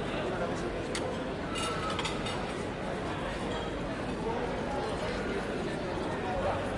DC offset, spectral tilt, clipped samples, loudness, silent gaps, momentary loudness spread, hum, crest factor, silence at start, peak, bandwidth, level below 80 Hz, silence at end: under 0.1%; -5 dB/octave; under 0.1%; -34 LUFS; none; 3 LU; none; 14 dB; 0 s; -20 dBFS; 11.5 kHz; -46 dBFS; 0 s